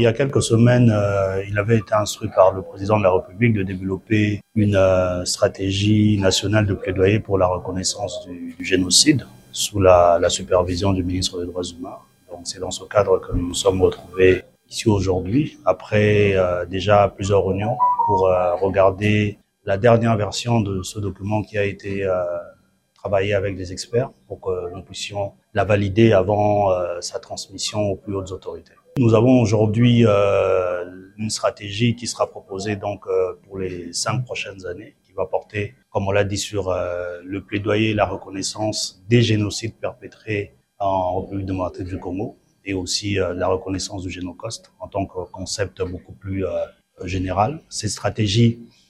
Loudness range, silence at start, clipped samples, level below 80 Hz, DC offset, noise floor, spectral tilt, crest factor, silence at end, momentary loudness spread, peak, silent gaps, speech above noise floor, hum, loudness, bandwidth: 8 LU; 0 s; under 0.1%; -46 dBFS; under 0.1%; -59 dBFS; -5 dB/octave; 20 dB; 0.25 s; 14 LU; 0 dBFS; none; 39 dB; none; -20 LUFS; 13.5 kHz